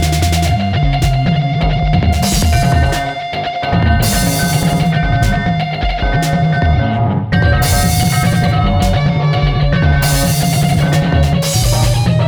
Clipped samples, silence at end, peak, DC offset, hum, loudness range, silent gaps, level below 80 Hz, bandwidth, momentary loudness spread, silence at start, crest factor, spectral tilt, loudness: under 0.1%; 0 s; 0 dBFS; under 0.1%; none; 1 LU; none; -20 dBFS; over 20 kHz; 3 LU; 0 s; 12 dB; -5 dB/octave; -13 LUFS